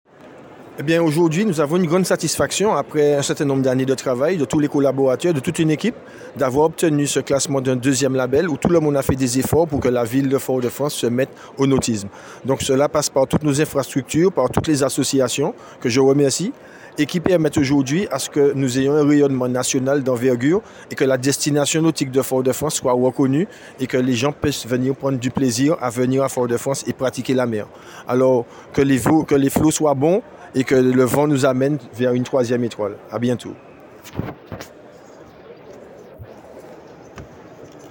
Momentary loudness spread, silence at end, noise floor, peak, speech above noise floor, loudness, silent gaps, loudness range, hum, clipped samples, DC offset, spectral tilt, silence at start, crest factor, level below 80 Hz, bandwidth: 9 LU; 0 s; -42 dBFS; 0 dBFS; 24 dB; -19 LUFS; none; 3 LU; none; under 0.1%; under 0.1%; -5 dB/octave; 0.25 s; 18 dB; -48 dBFS; 17 kHz